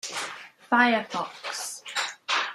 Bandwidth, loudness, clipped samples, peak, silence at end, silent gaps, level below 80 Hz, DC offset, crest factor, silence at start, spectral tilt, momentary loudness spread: 15 kHz; -27 LUFS; under 0.1%; -6 dBFS; 0 s; none; -82 dBFS; under 0.1%; 22 dB; 0.05 s; -1.5 dB/octave; 12 LU